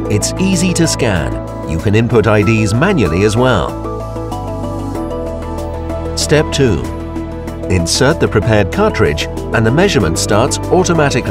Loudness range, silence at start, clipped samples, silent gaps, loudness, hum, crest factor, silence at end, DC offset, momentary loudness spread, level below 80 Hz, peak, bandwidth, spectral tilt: 5 LU; 0 s; under 0.1%; none; -14 LUFS; none; 12 dB; 0 s; under 0.1%; 11 LU; -28 dBFS; 0 dBFS; 16 kHz; -5 dB/octave